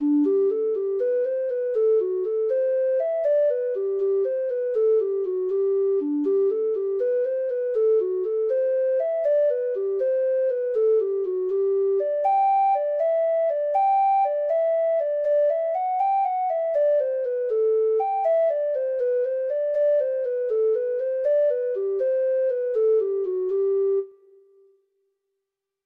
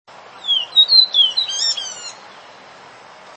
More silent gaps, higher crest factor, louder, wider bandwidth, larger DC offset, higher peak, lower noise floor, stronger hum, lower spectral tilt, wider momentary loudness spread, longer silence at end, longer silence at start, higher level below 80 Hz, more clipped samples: neither; second, 10 dB vs 18 dB; second, -23 LUFS vs -13 LUFS; second, 4.1 kHz vs 8.8 kHz; neither; second, -14 dBFS vs -2 dBFS; first, -83 dBFS vs -41 dBFS; neither; first, -6.5 dB/octave vs 2.5 dB/octave; second, 4 LU vs 19 LU; first, 1.75 s vs 0.95 s; second, 0 s vs 0.35 s; about the same, -76 dBFS vs -78 dBFS; neither